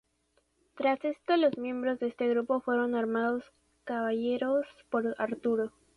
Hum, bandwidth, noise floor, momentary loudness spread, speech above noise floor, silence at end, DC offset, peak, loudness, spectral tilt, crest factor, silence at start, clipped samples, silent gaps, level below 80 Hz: none; 10.5 kHz; -73 dBFS; 6 LU; 44 dB; 0.3 s; under 0.1%; -16 dBFS; -31 LUFS; -6.5 dB/octave; 16 dB; 0.75 s; under 0.1%; none; -72 dBFS